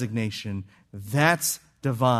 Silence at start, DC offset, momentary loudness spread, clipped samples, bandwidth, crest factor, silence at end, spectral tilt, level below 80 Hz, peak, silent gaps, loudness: 0 s; under 0.1%; 17 LU; under 0.1%; 14 kHz; 20 dB; 0 s; -4.5 dB/octave; -64 dBFS; -6 dBFS; none; -25 LUFS